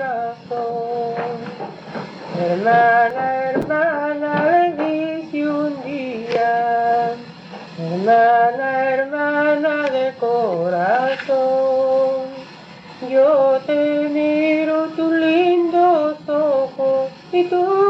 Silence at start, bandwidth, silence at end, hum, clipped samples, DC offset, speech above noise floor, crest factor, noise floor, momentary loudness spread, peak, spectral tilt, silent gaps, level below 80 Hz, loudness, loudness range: 0 s; 7.8 kHz; 0 s; none; under 0.1%; under 0.1%; 23 dB; 14 dB; -39 dBFS; 14 LU; -4 dBFS; -7 dB/octave; none; -64 dBFS; -18 LUFS; 3 LU